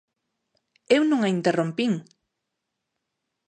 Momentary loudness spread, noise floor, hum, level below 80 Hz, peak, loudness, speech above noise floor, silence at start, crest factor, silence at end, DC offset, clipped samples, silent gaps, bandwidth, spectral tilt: 6 LU; -82 dBFS; none; -78 dBFS; -6 dBFS; -23 LUFS; 59 dB; 0.9 s; 22 dB; 1.45 s; under 0.1%; under 0.1%; none; 9.4 kHz; -6 dB/octave